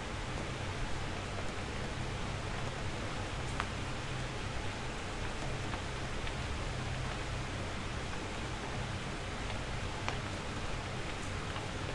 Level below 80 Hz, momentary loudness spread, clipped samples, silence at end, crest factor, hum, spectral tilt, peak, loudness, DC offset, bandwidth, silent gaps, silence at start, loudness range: -46 dBFS; 2 LU; under 0.1%; 0 s; 22 dB; none; -4.5 dB/octave; -16 dBFS; -39 LUFS; under 0.1%; 11.5 kHz; none; 0 s; 0 LU